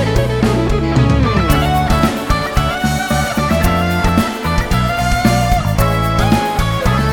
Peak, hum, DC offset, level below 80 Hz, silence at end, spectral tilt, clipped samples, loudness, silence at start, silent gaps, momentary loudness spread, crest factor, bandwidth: 0 dBFS; none; 0.2%; -20 dBFS; 0 s; -6 dB/octave; under 0.1%; -15 LUFS; 0 s; none; 3 LU; 14 dB; over 20 kHz